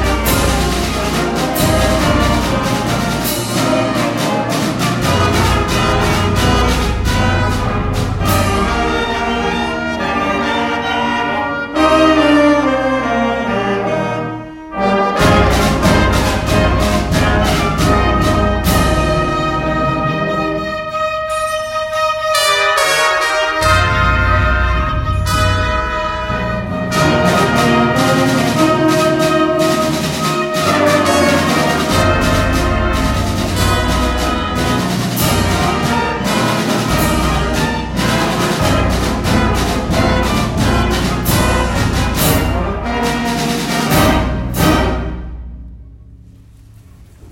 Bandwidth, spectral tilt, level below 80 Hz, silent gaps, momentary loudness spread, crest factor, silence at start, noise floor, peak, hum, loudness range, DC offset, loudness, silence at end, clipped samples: 16.5 kHz; -5 dB/octave; -24 dBFS; none; 6 LU; 14 dB; 0 s; -40 dBFS; 0 dBFS; none; 3 LU; under 0.1%; -14 LUFS; 0 s; under 0.1%